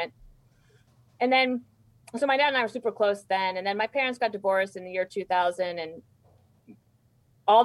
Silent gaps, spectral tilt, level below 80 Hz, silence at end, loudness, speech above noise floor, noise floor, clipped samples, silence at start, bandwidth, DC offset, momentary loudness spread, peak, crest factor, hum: none; -4 dB/octave; -68 dBFS; 0 s; -27 LUFS; 38 dB; -64 dBFS; under 0.1%; 0 s; 12 kHz; under 0.1%; 9 LU; -8 dBFS; 18 dB; none